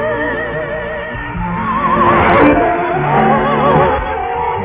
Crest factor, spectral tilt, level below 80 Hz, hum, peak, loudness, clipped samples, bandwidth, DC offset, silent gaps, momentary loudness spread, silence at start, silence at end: 14 dB; -10.5 dB/octave; -30 dBFS; none; 0 dBFS; -13 LUFS; under 0.1%; 4 kHz; under 0.1%; none; 11 LU; 0 s; 0 s